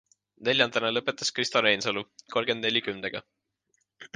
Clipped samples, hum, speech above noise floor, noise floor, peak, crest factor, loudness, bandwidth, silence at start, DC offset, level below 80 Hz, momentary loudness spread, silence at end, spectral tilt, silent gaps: under 0.1%; none; 47 dB; -75 dBFS; -6 dBFS; 24 dB; -26 LUFS; 10 kHz; 0.4 s; under 0.1%; -70 dBFS; 11 LU; 0.1 s; -2.5 dB/octave; none